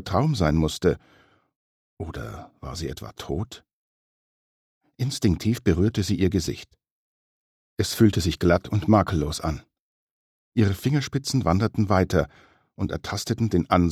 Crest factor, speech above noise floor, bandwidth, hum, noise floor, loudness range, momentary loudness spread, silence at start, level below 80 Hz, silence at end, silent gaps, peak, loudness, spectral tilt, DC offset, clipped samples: 20 dB; over 67 dB; 14.5 kHz; none; under -90 dBFS; 12 LU; 16 LU; 0 s; -42 dBFS; 0 s; 1.56-1.97 s, 3.73-4.81 s, 6.91-7.77 s, 9.80-10.52 s; -6 dBFS; -24 LUFS; -6 dB/octave; under 0.1%; under 0.1%